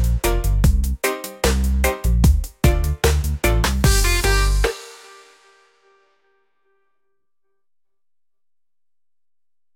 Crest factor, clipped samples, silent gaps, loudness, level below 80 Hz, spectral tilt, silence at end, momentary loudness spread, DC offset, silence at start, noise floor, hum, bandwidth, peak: 16 dB; under 0.1%; none; -19 LUFS; -22 dBFS; -4.5 dB/octave; 4.8 s; 5 LU; under 0.1%; 0 s; under -90 dBFS; none; 17 kHz; -4 dBFS